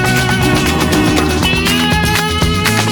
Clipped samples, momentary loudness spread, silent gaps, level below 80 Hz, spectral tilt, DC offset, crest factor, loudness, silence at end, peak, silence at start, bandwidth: under 0.1%; 1 LU; none; -24 dBFS; -4 dB/octave; under 0.1%; 12 dB; -12 LUFS; 0 s; -2 dBFS; 0 s; 19.5 kHz